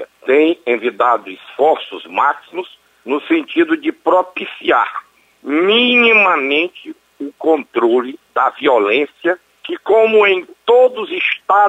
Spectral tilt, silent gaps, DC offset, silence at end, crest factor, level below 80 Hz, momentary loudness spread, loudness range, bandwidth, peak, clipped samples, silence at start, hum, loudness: -5 dB/octave; none; under 0.1%; 0 s; 14 dB; -66 dBFS; 14 LU; 4 LU; 8.6 kHz; -2 dBFS; under 0.1%; 0 s; none; -14 LUFS